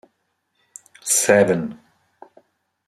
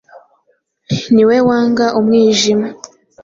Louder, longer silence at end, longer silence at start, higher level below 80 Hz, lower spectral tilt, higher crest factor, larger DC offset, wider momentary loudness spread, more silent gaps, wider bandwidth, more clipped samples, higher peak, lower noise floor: second, -17 LUFS vs -12 LUFS; first, 1.15 s vs 0.5 s; first, 1.05 s vs 0.15 s; second, -66 dBFS vs -52 dBFS; second, -3.5 dB/octave vs -5 dB/octave; first, 22 dB vs 12 dB; neither; first, 17 LU vs 11 LU; neither; first, 14.5 kHz vs 7.8 kHz; neither; about the same, 0 dBFS vs -2 dBFS; first, -71 dBFS vs -61 dBFS